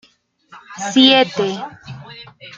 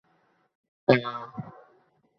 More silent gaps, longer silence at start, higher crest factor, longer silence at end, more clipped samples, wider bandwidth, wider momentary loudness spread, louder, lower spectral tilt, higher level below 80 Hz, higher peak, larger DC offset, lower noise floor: neither; second, 0.55 s vs 0.9 s; second, 18 dB vs 26 dB; second, 0.05 s vs 0.7 s; neither; first, 7.6 kHz vs 6.4 kHz; first, 26 LU vs 19 LU; first, -14 LUFS vs -26 LUFS; second, -3.5 dB/octave vs -8.5 dB/octave; about the same, -62 dBFS vs -64 dBFS; first, 0 dBFS vs -4 dBFS; neither; second, -54 dBFS vs -68 dBFS